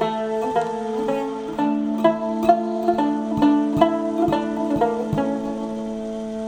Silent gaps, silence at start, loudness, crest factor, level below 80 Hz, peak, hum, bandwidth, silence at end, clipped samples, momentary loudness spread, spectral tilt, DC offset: none; 0 s; -22 LUFS; 20 dB; -50 dBFS; -2 dBFS; none; 19 kHz; 0 s; under 0.1%; 9 LU; -7 dB/octave; under 0.1%